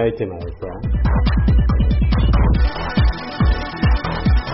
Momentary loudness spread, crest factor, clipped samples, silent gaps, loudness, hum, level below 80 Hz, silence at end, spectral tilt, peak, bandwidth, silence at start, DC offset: 9 LU; 10 dB; under 0.1%; none; -18 LUFS; none; -18 dBFS; 0 s; -6.5 dB/octave; -6 dBFS; 5.8 kHz; 0 s; under 0.1%